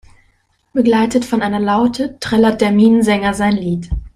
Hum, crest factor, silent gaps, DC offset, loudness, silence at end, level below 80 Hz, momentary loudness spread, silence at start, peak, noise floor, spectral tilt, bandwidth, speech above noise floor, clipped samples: none; 14 dB; none; under 0.1%; -15 LUFS; 0.1 s; -34 dBFS; 9 LU; 0.75 s; 0 dBFS; -58 dBFS; -6 dB/octave; 13.5 kHz; 45 dB; under 0.1%